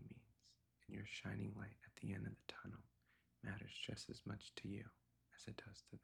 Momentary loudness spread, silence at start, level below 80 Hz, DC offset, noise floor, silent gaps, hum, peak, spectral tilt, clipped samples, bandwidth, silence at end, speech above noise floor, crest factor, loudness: 11 LU; 0 s; -74 dBFS; under 0.1%; -77 dBFS; none; none; -32 dBFS; -5 dB/octave; under 0.1%; 13.5 kHz; 0.05 s; 24 dB; 22 dB; -53 LUFS